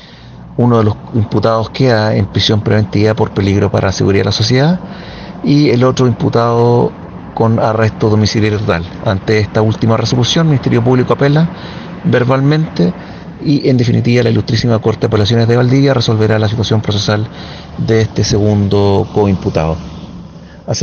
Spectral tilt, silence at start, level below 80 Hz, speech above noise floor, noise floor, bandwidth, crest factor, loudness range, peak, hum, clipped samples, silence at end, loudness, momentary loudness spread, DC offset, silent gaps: -6.5 dB/octave; 0.05 s; -38 dBFS; 22 dB; -33 dBFS; 7 kHz; 12 dB; 2 LU; 0 dBFS; none; under 0.1%; 0 s; -12 LUFS; 10 LU; under 0.1%; none